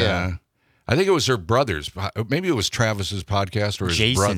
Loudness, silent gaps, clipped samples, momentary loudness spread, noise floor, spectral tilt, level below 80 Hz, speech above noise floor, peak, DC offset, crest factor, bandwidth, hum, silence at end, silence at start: -22 LUFS; none; under 0.1%; 9 LU; -62 dBFS; -4.5 dB/octave; -46 dBFS; 41 dB; -2 dBFS; under 0.1%; 20 dB; 16 kHz; none; 0 s; 0 s